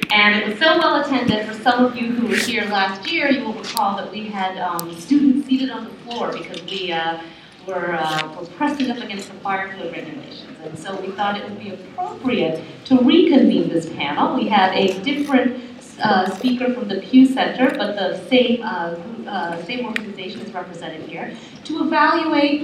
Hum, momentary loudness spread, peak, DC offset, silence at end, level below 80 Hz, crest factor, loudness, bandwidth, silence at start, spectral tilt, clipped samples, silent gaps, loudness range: none; 16 LU; 0 dBFS; under 0.1%; 0 s; -60 dBFS; 18 dB; -19 LUFS; 15.5 kHz; 0 s; -4.5 dB/octave; under 0.1%; none; 9 LU